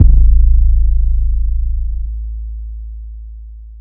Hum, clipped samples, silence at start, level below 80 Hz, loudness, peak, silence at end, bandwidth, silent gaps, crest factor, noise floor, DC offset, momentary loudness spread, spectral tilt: none; 0.6%; 0 s; -12 dBFS; -16 LUFS; 0 dBFS; 0 s; 0.6 kHz; none; 12 dB; -31 dBFS; under 0.1%; 21 LU; -16 dB/octave